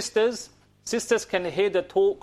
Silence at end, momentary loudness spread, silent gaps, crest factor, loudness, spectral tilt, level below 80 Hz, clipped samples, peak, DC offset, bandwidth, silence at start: 0.05 s; 14 LU; none; 14 dB; -25 LUFS; -3 dB/octave; -62 dBFS; under 0.1%; -10 dBFS; under 0.1%; 13 kHz; 0 s